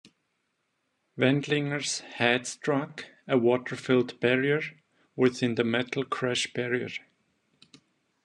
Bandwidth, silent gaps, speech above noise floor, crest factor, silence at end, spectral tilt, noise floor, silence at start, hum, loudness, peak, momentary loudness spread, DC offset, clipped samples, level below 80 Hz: 11 kHz; none; 50 dB; 20 dB; 1.25 s; -4.5 dB/octave; -77 dBFS; 1.15 s; none; -27 LUFS; -8 dBFS; 13 LU; under 0.1%; under 0.1%; -74 dBFS